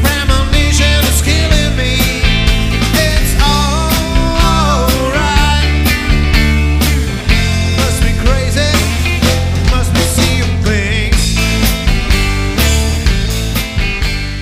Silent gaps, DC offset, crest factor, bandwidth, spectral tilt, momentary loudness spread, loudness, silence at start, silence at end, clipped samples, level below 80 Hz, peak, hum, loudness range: none; under 0.1%; 10 dB; 15.5 kHz; -4.5 dB/octave; 3 LU; -12 LUFS; 0 s; 0 s; under 0.1%; -14 dBFS; 0 dBFS; none; 1 LU